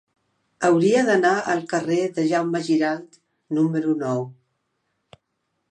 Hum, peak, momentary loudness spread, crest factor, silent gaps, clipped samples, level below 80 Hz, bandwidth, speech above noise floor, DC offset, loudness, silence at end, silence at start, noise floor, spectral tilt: none; -6 dBFS; 9 LU; 18 dB; none; under 0.1%; -74 dBFS; 9.8 kHz; 55 dB; under 0.1%; -21 LUFS; 1.4 s; 0.6 s; -75 dBFS; -6 dB/octave